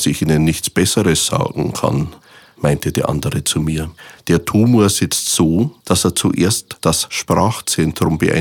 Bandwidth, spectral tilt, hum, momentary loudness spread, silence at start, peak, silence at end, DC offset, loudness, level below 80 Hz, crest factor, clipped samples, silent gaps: 18 kHz; -4.5 dB/octave; none; 5 LU; 0 s; 0 dBFS; 0 s; under 0.1%; -16 LUFS; -38 dBFS; 16 dB; under 0.1%; none